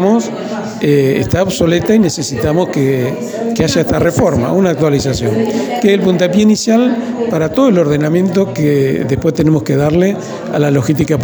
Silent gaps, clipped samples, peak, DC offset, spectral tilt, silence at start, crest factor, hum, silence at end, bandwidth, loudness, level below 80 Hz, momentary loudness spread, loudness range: none; under 0.1%; 0 dBFS; under 0.1%; -6 dB/octave; 0 s; 12 dB; none; 0 s; over 20 kHz; -13 LUFS; -38 dBFS; 6 LU; 1 LU